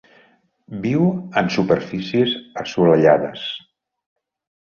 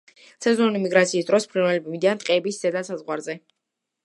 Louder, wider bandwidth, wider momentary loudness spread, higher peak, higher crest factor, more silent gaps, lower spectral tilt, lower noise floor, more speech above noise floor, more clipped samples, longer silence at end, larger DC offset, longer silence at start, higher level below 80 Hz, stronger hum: first, -19 LUFS vs -22 LUFS; second, 7 kHz vs 11.5 kHz; first, 14 LU vs 10 LU; about the same, -2 dBFS vs -2 dBFS; about the same, 18 dB vs 20 dB; neither; first, -7 dB/octave vs -4.5 dB/octave; second, -57 dBFS vs -82 dBFS; second, 39 dB vs 60 dB; neither; first, 1.1 s vs 0.65 s; neither; first, 0.7 s vs 0.4 s; first, -56 dBFS vs -76 dBFS; neither